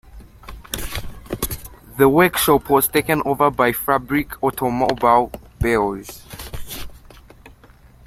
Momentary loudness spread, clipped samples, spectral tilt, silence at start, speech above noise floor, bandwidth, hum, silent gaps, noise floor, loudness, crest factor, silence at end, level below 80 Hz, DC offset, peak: 18 LU; under 0.1%; -4.5 dB/octave; 0.15 s; 30 dB; 16.5 kHz; none; none; -48 dBFS; -18 LUFS; 20 dB; 0.6 s; -38 dBFS; under 0.1%; -2 dBFS